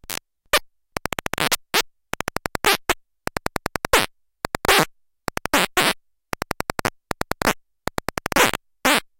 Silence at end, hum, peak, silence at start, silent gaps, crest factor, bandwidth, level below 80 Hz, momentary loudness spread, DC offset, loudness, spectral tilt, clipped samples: 0.15 s; none; -2 dBFS; 0.1 s; none; 22 dB; 17 kHz; -42 dBFS; 13 LU; under 0.1%; -22 LUFS; -2 dB/octave; under 0.1%